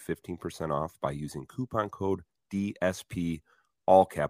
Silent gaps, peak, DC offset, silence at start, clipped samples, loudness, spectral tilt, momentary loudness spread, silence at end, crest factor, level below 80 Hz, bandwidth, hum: none; -8 dBFS; under 0.1%; 0 s; under 0.1%; -31 LUFS; -6.5 dB/octave; 15 LU; 0 s; 22 dB; -58 dBFS; 15.5 kHz; none